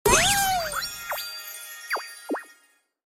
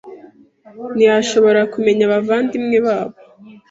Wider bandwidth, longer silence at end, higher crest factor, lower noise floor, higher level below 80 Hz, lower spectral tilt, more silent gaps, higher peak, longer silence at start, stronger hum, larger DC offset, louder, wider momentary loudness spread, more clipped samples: first, 17 kHz vs 7.8 kHz; first, 0.55 s vs 0.2 s; first, 22 dB vs 14 dB; first, -63 dBFS vs -44 dBFS; first, -44 dBFS vs -60 dBFS; second, -1.5 dB/octave vs -5 dB/octave; neither; second, -6 dBFS vs -2 dBFS; about the same, 0.05 s vs 0.05 s; neither; neither; second, -25 LUFS vs -15 LUFS; first, 16 LU vs 11 LU; neither